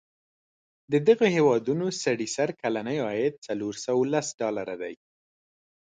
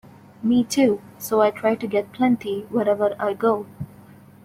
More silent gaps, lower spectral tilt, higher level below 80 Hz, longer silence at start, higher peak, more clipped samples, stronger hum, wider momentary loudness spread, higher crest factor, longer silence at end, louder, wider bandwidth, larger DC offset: first, 3.38-3.42 s, 4.34-4.38 s vs none; about the same, -5 dB/octave vs -5.5 dB/octave; second, -70 dBFS vs -60 dBFS; first, 0.9 s vs 0.4 s; about the same, -8 dBFS vs -6 dBFS; neither; neither; first, 12 LU vs 9 LU; about the same, 20 dB vs 16 dB; first, 1 s vs 0.6 s; second, -26 LUFS vs -22 LUFS; second, 9.4 kHz vs 16 kHz; neither